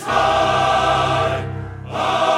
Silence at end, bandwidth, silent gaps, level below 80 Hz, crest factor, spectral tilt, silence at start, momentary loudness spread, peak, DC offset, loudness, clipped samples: 0 s; 14 kHz; none; -40 dBFS; 14 dB; -4.5 dB/octave; 0 s; 12 LU; -4 dBFS; under 0.1%; -18 LUFS; under 0.1%